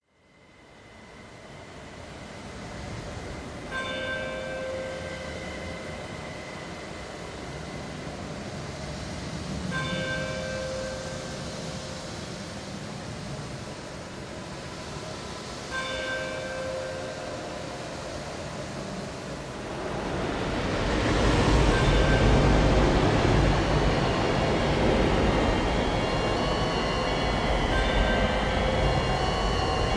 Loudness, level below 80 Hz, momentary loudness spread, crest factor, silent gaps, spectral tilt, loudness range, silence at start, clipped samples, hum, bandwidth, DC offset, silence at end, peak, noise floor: -28 LUFS; -34 dBFS; 15 LU; 20 dB; none; -5.5 dB/octave; 14 LU; 0.6 s; under 0.1%; none; 11 kHz; under 0.1%; 0 s; -8 dBFS; -58 dBFS